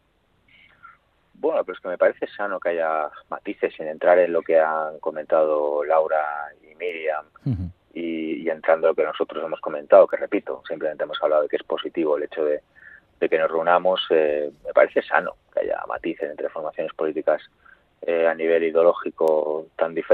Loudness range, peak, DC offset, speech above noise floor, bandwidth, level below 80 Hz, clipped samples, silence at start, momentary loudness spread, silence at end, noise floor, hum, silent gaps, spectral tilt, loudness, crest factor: 4 LU; 0 dBFS; under 0.1%; 41 dB; 4.4 kHz; -64 dBFS; under 0.1%; 1.45 s; 11 LU; 0 s; -63 dBFS; none; none; -7.5 dB/octave; -23 LUFS; 22 dB